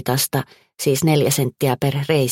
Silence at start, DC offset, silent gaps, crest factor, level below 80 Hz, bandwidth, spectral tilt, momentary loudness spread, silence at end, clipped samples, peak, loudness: 0 s; under 0.1%; none; 16 dB; -54 dBFS; 17 kHz; -5 dB/octave; 8 LU; 0 s; under 0.1%; -4 dBFS; -19 LUFS